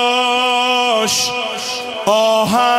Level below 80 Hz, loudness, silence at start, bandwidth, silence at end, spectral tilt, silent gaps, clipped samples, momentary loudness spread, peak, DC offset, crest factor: -58 dBFS; -15 LUFS; 0 s; 16 kHz; 0 s; -2 dB/octave; none; under 0.1%; 7 LU; -4 dBFS; under 0.1%; 12 dB